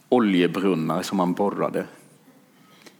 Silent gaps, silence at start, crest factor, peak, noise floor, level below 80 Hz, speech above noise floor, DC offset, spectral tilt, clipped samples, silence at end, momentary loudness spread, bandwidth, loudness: none; 0.1 s; 18 dB; -6 dBFS; -54 dBFS; -74 dBFS; 32 dB; under 0.1%; -6 dB/octave; under 0.1%; 1.1 s; 8 LU; 18 kHz; -23 LUFS